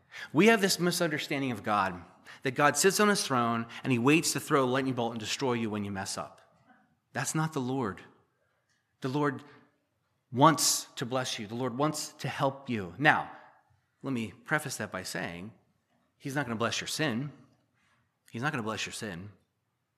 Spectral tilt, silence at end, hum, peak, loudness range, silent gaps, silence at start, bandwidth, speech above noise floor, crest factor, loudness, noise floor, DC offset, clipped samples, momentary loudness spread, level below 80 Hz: -4 dB/octave; 0.65 s; none; -6 dBFS; 9 LU; none; 0.1 s; 15 kHz; 50 dB; 26 dB; -29 LUFS; -79 dBFS; under 0.1%; under 0.1%; 15 LU; -74 dBFS